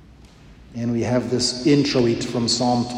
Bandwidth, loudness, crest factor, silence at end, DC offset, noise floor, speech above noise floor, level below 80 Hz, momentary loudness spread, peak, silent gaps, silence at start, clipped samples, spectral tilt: 10.5 kHz; -20 LUFS; 16 dB; 0 s; under 0.1%; -46 dBFS; 26 dB; -48 dBFS; 8 LU; -6 dBFS; none; 0.25 s; under 0.1%; -5 dB/octave